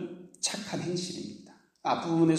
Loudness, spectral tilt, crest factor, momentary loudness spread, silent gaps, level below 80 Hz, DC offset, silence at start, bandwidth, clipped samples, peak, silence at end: -32 LUFS; -4.5 dB/octave; 18 dB; 14 LU; none; -72 dBFS; under 0.1%; 0 s; 13.5 kHz; under 0.1%; -12 dBFS; 0 s